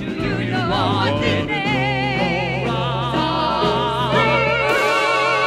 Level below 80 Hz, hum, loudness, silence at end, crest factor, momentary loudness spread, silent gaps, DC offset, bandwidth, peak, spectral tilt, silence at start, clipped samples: -40 dBFS; none; -18 LUFS; 0 s; 14 dB; 5 LU; none; under 0.1%; 15 kHz; -4 dBFS; -5.5 dB/octave; 0 s; under 0.1%